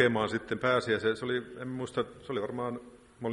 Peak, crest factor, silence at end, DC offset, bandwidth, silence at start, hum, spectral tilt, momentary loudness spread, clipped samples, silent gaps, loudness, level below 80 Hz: -8 dBFS; 22 dB; 0 s; under 0.1%; 11.5 kHz; 0 s; none; -5.5 dB/octave; 11 LU; under 0.1%; none; -32 LUFS; -64 dBFS